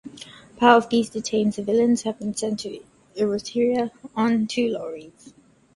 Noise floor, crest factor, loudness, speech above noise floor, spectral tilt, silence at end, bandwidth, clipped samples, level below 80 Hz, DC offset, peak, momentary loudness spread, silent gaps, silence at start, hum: -44 dBFS; 22 dB; -22 LUFS; 22 dB; -4.5 dB/octave; 0.45 s; 11.5 kHz; under 0.1%; -62 dBFS; under 0.1%; 0 dBFS; 22 LU; none; 0.05 s; none